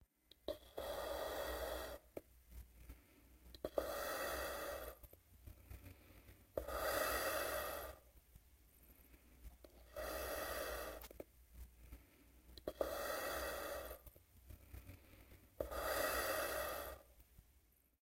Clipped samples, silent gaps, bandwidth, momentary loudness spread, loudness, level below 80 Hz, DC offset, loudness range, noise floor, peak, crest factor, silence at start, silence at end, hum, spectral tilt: under 0.1%; none; 16 kHz; 23 LU; -45 LUFS; -60 dBFS; under 0.1%; 5 LU; -74 dBFS; -22 dBFS; 26 dB; 0 s; 0.4 s; none; -3 dB/octave